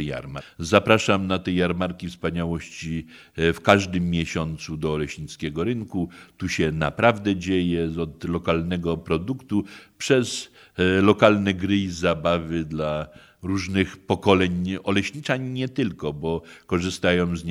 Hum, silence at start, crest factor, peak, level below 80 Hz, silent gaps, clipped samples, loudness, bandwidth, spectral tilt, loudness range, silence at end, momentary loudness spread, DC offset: none; 0 s; 24 dB; 0 dBFS; -46 dBFS; none; under 0.1%; -24 LUFS; 13.5 kHz; -5.5 dB/octave; 3 LU; 0 s; 12 LU; under 0.1%